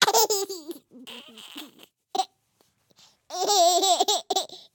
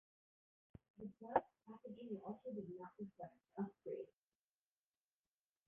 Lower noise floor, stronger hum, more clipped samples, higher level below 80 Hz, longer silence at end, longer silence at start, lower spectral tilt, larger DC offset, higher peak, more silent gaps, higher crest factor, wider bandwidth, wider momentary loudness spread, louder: second, -68 dBFS vs under -90 dBFS; neither; neither; about the same, -80 dBFS vs -84 dBFS; second, 0.2 s vs 1.6 s; second, 0 s vs 1 s; second, 0.5 dB/octave vs -3.5 dB/octave; neither; first, -2 dBFS vs -20 dBFS; neither; second, 26 dB vs 32 dB; first, 18 kHz vs 3.6 kHz; first, 22 LU vs 18 LU; first, -23 LUFS vs -49 LUFS